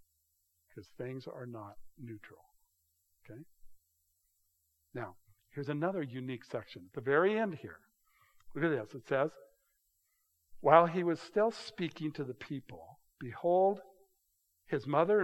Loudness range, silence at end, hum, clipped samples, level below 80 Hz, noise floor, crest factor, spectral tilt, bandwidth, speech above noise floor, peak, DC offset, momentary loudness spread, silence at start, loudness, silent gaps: 19 LU; 0 s; none; under 0.1%; -74 dBFS; -78 dBFS; 28 dB; -7 dB/octave; 13 kHz; 45 dB; -8 dBFS; under 0.1%; 22 LU; 0.75 s; -34 LUFS; none